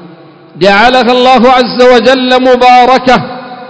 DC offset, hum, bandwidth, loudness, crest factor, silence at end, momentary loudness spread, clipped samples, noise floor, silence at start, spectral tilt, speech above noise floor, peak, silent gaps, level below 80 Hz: under 0.1%; none; 8 kHz; -5 LUFS; 6 dB; 0 s; 5 LU; 10%; -33 dBFS; 0 s; -4.5 dB/octave; 28 dB; 0 dBFS; none; -38 dBFS